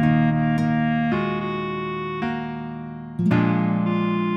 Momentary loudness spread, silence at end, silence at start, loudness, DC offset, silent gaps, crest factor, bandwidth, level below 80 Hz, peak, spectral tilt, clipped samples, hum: 11 LU; 0 s; 0 s; -23 LUFS; under 0.1%; none; 14 dB; 7 kHz; -50 dBFS; -8 dBFS; -9 dB/octave; under 0.1%; none